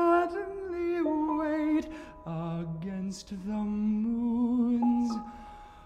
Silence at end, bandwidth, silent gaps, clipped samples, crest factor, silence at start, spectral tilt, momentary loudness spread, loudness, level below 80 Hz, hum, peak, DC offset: 0 s; 9.2 kHz; none; under 0.1%; 16 dB; 0 s; -7.5 dB/octave; 12 LU; -30 LUFS; -54 dBFS; none; -14 dBFS; under 0.1%